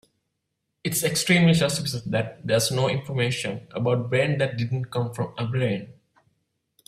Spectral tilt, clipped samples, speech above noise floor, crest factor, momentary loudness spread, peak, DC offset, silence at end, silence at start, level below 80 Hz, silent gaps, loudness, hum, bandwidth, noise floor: -5 dB/octave; under 0.1%; 55 dB; 18 dB; 10 LU; -8 dBFS; under 0.1%; 0.95 s; 0.85 s; -58 dBFS; none; -24 LUFS; none; 15.5 kHz; -79 dBFS